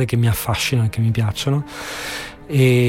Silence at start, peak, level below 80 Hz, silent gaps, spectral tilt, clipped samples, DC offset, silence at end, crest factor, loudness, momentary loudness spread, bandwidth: 0 s; -4 dBFS; -42 dBFS; none; -5.5 dB/octave; under 0.1%; under 0.1%; 0 s; 14 dB; -20 LUFS; 10 LU; 16.5 kHz